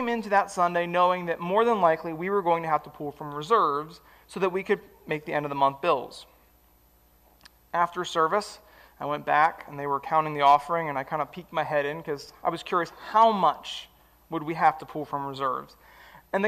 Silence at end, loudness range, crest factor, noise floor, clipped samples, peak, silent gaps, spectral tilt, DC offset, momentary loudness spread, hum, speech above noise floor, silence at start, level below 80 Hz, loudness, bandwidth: 0 s; 5 LU; 18 dB; -60 dBFS; under 0.1%; -8 dBFS; none; -5 dB/octave; under 0.1%; 14 LU; none; 34 dB; 0 s; -64 dBFS; -26 LUFS; 15.5 kHz